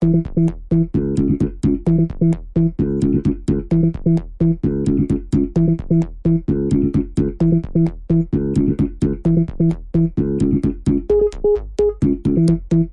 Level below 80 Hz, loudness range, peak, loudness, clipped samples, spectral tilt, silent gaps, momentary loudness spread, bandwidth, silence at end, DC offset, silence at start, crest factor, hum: -30 dBFS; 0 LU; -4 dBFS; -18 LUFS; under 0.1%; -10 dB/octave; none; 3 LU; 9.6 kHz; 0 s; under 0.1%; 0 s; 12 dB; none